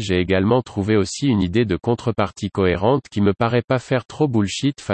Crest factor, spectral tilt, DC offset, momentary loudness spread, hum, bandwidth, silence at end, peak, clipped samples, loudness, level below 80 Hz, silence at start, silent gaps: 16 dB; -6.5 dB/octave; under 0.1%; 4 LU; none; 8.8 kHz; 0 s; -4 dBFS; under 0.1%; -20 LUFS; -48 dBFS; 0 s; 3.64-3.68 s, 4.05-4.09 s